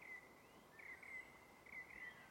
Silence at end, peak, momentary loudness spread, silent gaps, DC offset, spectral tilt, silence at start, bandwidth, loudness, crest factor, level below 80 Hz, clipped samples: 0 s; -44 dBFS; 10 LU; none; under 0.1%; -3 dB/octave; 0 s; 16.5 kHz; -56 LUFS; 14 dB; -82 dBFS; under 0.1%